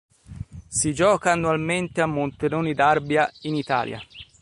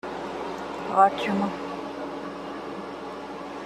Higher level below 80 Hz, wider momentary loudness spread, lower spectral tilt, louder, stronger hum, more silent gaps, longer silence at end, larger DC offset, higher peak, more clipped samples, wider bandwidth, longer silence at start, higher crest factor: first, -50 dBFS vs -60 dBFS; first, 18 LU vs 15 LU; second, -4.5 dB/octave vs -6 dB/octave; first, -22 LUFS vs -28 LUFS; neither; neither; first, 0.2 s vs 0 s; neither; about the same, -6 dBFS vs -6 dBFS; neither; second, 11.5 kHz vs 13 kHz; first, 0.3 s vs 0.05 s; about the same, 18 dB vs 22 dB